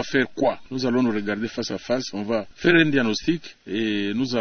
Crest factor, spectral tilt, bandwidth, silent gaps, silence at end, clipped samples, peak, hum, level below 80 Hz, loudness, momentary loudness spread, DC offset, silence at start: 18 dB; -5 dB/octave; 6.6 kHz; none; 0 s; under 0.1%; -4 dBFS; none; -54 dBFS; -23 LUFS; 9 LU; under 0.1%; 0 s